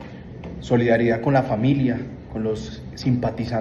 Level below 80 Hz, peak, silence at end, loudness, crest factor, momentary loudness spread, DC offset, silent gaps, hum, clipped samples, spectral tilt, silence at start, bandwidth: -44 dBFS; -4 dBFS; 0 s; -22 LUFS; 18 dB; 16 LU; under 0.1%; none; none; under 0.1%; -8 dB/octave; 0 s; 7.8 kHz